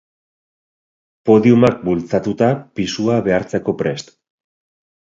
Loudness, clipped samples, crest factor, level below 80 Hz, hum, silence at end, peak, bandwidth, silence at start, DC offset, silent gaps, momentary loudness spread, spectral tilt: -16 LUFS; under 0.1%; 18 dB; -50 dBFS; none; 1 s; 0 dBFS; 7.6 kHz; 1.25 s; under 0.1%; none; 11 LU; -7 dB/octave